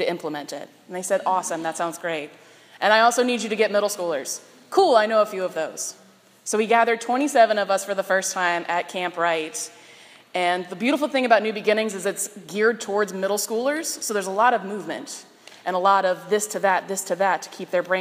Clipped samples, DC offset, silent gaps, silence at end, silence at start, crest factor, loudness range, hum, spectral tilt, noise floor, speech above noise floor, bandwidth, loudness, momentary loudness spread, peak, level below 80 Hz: under 0.1%; under 0.1%; none; 0 s; 0 s; 22 dB; 3 LU; none; -2.5 dB/octave; -48 dBFS; 26 dB; 15.5 kHz; -22 LUFS; 13 LU; -2 dBFS; -86 dBFS